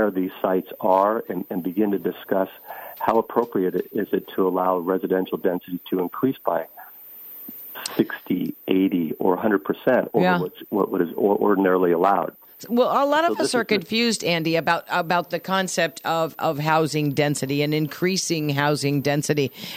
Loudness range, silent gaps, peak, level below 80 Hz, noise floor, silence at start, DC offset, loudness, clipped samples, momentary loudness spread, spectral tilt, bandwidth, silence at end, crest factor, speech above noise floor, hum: 5 LU; none; -6 dBFS; -66 dBFS; -42 dBFS; 0 s; under 0.1%; -22 LUFS; under 0.1%; 9 LU; -5 dB/octave; 17 kHz; 0 s; 18 dB; 20 dB; none